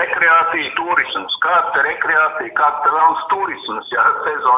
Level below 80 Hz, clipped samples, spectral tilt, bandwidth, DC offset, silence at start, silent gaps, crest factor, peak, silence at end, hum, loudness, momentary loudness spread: -60 dBFS; under 0.1%; -5.5 dB/octave; 3.9 kHz; under 0.1%; 0 s; none; 14 dB; -2 dBFS; 0 s; none; -15 LUFS; 8 LU